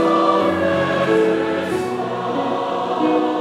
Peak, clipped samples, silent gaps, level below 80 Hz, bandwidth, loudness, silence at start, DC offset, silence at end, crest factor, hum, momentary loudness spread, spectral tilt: -2 dBFS; under 0.1%; none; -60 dBFS; 13 kHz; -19 LUFS; 0 s; under 0.1%; 0 s; 16 dB; none; 6 LU; -6 dB/octave